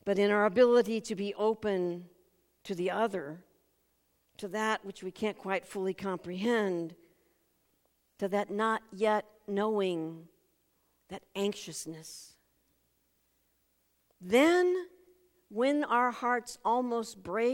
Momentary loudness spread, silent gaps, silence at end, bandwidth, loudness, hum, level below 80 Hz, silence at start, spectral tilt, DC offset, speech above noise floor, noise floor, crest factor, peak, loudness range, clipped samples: 19 LU; none; 0 s; 16.5 kHz; -31 LUFS; none; -74 dBFS; 0.05 s; -5 dB/octave; under 0.1%; 44 dB; -74 dBFS; 20 dB; -12 dBFS; 10 LU; under 0.1%